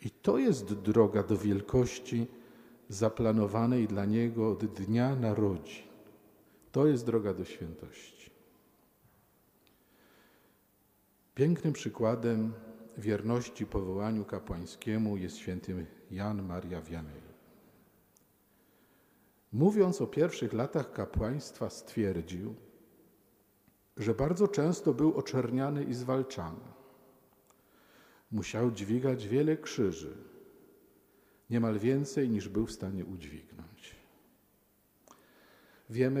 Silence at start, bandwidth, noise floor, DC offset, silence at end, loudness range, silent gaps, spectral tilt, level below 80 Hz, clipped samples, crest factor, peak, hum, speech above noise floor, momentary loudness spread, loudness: 0 s; 15.5 kHz; -69 dBFS; under 0.1%; 0 s; 9 LU; none; -7 dB/octave; -56 dBFS; under 0.1%; 24 dB; -10 dBFS; 50 Hz at -60 dBFS; 38 dB; 16 LU; -32 LUFS